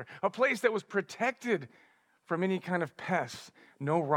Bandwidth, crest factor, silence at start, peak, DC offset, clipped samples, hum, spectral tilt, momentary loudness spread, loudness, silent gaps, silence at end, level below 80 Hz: 16.5 kHz; 20 dB; 0 s; -12 dBFS; under 0.1%; under 0.1%; none; -6 dB/octave; 10 LU; -32 LUFS; none; 0 s; -86 dBFS